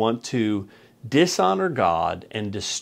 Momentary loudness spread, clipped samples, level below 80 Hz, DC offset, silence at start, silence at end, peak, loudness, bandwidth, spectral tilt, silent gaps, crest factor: 10 LU; under 0.1%; -58 dBFS; under 0.1%; 0 s; 0 s; -6 dBFS; -23 LUFS; 16 kHz; -4.5 dB/octave; none; 18 dB